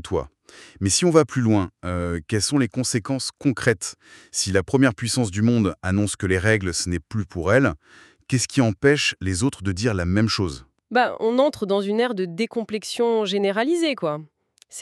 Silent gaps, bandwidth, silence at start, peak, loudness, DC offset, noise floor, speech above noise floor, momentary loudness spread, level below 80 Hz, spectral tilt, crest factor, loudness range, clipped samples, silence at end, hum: none; 13 kHz; 0.05 s; -2 dBFS; -22 LUFS; under 0.1%; -43 dBFS; 22 dB; 9 LU; -48 dBFS; -4.5 dB/octave; 20 dB; 1 LU; under 0.1%; 0 s; none